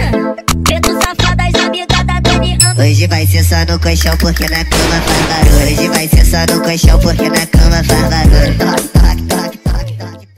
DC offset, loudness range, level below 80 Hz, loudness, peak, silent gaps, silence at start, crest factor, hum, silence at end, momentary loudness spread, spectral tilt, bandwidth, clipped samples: under 0.1%; 1 LU; -14 dBFS; -11 LUFS; 0 dBFS; none; 0 s; 10 dB; none; 0.15 s; 6 LU; -4.5 dB/octave; 16.5 kHz; under 0.1%